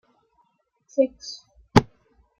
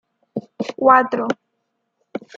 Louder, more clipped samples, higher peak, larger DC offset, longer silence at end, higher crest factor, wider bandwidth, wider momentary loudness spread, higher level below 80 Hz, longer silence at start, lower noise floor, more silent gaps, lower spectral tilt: second, -23 LUFS vs -17 LUFS; neither; about the same, 0 dBFS vs -2 dBFS; neither; first, 0.55 s vs 0.2 s; first, 26 dB vs 20 dB; first, 15 kHz vs 7.6 kHz; about the same, 20 LU vs 20 LU; first, -48 dBFS vs -68 dBFS; first, 0.95 s vs 0.35 s; second, -68 dBFS vs -73 dBFS; neither; about the same, -6 dB/octave vs -6 dB/octave